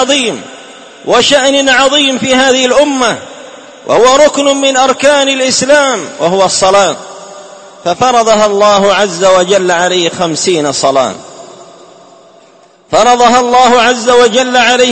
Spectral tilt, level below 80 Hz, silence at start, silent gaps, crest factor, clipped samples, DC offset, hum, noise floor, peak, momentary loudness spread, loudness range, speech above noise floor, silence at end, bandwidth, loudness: -2.5 dB/octave; -46 dBFS; 0 s; none; 10 dB; 0.8%; 0.3%; none; -42 dBFS; 0 dBFS; 10 LU; 3 LU; 34 dB; 0 s; 11 kHz; -8 LUFS